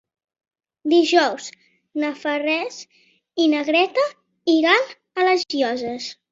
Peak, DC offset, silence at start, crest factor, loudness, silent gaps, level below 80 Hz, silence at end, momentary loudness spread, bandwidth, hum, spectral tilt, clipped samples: -4 dBFS; under 0.1%; 0.85 s; 18 dB; -20 LUFS; none; -70 dBFS; 0.2 s; 15 LU; 7.8 kHz; none; -2.5 dB/octave; under 0.1%